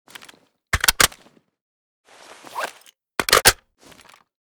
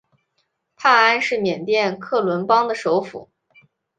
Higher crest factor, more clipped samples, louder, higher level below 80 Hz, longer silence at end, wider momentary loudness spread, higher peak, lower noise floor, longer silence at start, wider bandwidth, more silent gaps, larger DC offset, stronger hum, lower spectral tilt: about the same, 22 dB vs 18 dB; neither; about the same, -18 LUFS vs -18 LUFS; first, -42 dBFS vs -68 dBFS; first, 1 s vs 0.75 s; first, 18 LU vs 8 LU; about the same, -2 dBFS vs -2 dBFS; second, -54 dBFS vs -71 dBFS; about the same, 0.75 s vs 0.8 s; first, over 20 kHz vs 9.4 kHz; first, 1.61-2.04 s vs none; neither; neither; second, -0.5 dB/octave vs -4.5 dB/octave